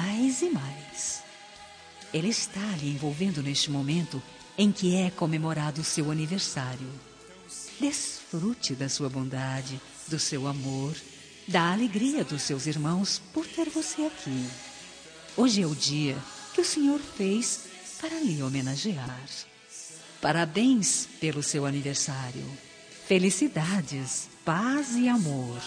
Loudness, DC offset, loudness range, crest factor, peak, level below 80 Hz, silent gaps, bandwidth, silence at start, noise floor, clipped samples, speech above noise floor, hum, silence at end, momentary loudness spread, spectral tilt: -28 LUFS; under 0.1%; 4 LU; 22 dB; -8 dBFS; -66 dBFS; none; 10.5 kHz; 0 s; -49 dBFS; under 0.1%; 20 dB; none; 0 s; 17 LU; -4 dB/octave